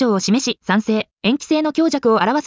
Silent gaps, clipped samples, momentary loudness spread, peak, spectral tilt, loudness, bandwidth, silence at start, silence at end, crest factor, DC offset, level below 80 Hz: 1.13-1.17 s; under 0.1%; 4 LU; -4 dBFS; -4.5 dB/octave; -18 LUFS; 7.6 kHz; 0 s; 0 s; 12 dB; under 0.1%; -60 dBFS